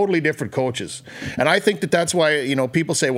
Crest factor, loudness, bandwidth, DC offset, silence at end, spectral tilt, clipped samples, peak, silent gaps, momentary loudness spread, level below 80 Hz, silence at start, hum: 20 dB; -20 LUFS; 16 kHz; under 0.1%; 0 s; -4 dB/octave; under 0.1%; 0 dBFS; none; 12 LU; -58 dBFS; 0 s; none